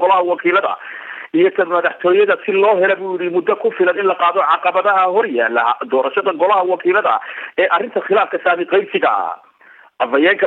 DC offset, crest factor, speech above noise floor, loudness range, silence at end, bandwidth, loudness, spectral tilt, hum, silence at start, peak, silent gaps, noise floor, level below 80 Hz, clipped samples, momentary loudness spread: under 0.1%; 14 dB; 31 dB; 2 LU; 0 s; 4.1 kHz; -15 LUFS; -6.5 dB/octave; none; 0 s; -2 dBFS; none; -46 dBFS; -70 dBFS; under 0.1%; 7 LU